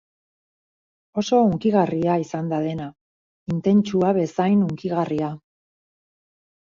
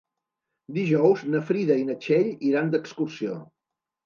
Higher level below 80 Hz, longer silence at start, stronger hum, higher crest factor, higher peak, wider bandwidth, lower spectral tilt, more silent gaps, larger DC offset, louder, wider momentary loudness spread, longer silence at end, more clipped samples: first, -60 dBFS vs -78 dBFS; first, 1.15 s vs 0.7 s; neither; about the same, 18 dB vs 18 dB; about the same, -6 dBFS vs -8 dBFS; about the same, 7.4 kHz vs 7.2 kHz; about the same, -7.5 dB/octave vs -8 dB/octave; first, 3.01-3.46 s vs none; neither; about the same, -22 LUFS vs -24 LUFS; about the same, 12 LU vs 12 LU; first, 1.3 s vs 0.6 s; neither